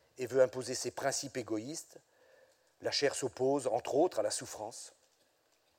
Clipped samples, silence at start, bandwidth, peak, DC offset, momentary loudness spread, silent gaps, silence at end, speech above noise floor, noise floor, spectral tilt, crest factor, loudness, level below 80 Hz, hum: under 0.1%; 0.2 s; 16.5 kHz; -14 dBFS; under 0.1%; 14 LU; none; 0.9 s; 39 dB; -73 dBFS; -3 dB/octave; 22 dB; -34 LUFS; -78 dBFS; none